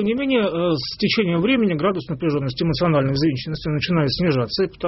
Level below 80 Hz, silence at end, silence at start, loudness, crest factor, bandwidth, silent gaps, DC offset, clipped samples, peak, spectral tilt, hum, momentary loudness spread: -44 dBFS; 0 s; 0 s; -20 LUFS; 14 dB; 6 kHz; none; under 0.1%; under 0.1%; -6 dBFS; -5 dB/octave; none; 5 LU